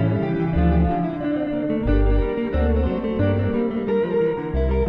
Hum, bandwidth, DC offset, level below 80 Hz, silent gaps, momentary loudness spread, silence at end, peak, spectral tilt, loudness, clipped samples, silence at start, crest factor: none; 5 kHz; under 0.1%; -26 dBFS; none; 4 LU; 0 s; -8 dBFS; -11 dB/octave; -22 LUFS; under 0.1%; 0 s; 12 dB